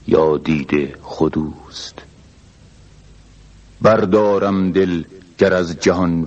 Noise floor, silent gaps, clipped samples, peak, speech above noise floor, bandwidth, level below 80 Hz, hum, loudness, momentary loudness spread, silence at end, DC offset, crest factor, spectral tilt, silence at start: -46 dBFS; none; under 0.1%; 0 dBFS; 29 dB; 8.4 kHz; -44 dBFS; none; -17 LUFS; 16 LU; 0 s; under 0.1%; 18 dB; -6.5 dB/octave; 0.05 s